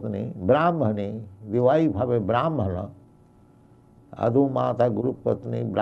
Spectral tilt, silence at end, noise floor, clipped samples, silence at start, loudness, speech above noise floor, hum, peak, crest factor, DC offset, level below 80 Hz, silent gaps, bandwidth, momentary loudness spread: -9.5 dB/octave; 0 s; -54 dBFS; under 0.1%; 0 s; -24 LUFS; 31 dB; none; -6 dBFS; 18 dB; under 0.1%; -58 dBFS; none; 6.4 kHz; 10 LU